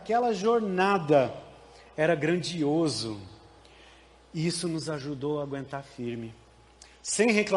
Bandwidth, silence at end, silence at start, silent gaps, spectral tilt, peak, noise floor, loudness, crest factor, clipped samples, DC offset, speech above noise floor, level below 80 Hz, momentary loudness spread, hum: 11.5 kHz; 0 s; 0 s; none; -5 dB/octave; -8 dBFS; -55 dBFS; -28 LUFS; 20 dB; under 0.1%; under 0.1%; 28 dB; -62 dBFS; 16 LU; none